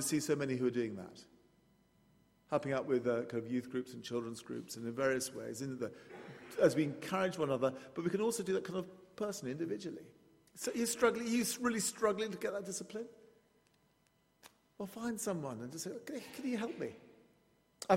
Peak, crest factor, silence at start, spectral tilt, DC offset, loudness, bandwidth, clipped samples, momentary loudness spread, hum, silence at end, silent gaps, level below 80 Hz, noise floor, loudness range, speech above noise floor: -14 dBFS; 24 dB; 0 s; -4.5 dB/octave; under 0.1%; -38 LUFS; 16 kHz; under 0.1%; 13 LU; none; 0 s; none; -76 dBFS; -74 dBFS; 7 LU; 37 dB